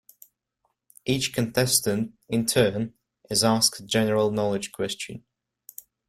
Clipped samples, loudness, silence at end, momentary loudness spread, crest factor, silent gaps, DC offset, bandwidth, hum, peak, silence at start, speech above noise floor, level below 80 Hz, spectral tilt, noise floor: under 0.1%; -24 LUFS; 0.9 s; 15 LU; 20 dB; none; under 0.1%; 16.5 kHz; none; -6 dBFS; 1.05 s; 51 dB; -58 dBFS; -3.5 dB/octave; -76 dBFS